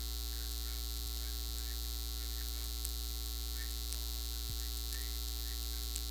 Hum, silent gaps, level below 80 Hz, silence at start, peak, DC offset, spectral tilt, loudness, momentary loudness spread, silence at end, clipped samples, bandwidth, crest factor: none; none; -40 dBFS; 0 s; -12 dBFS; under 0.1%; -2.5 dB/octave; -40 LUFS; 1 LU; 0 s; under 0.1%; over 20 kHz; 26 dB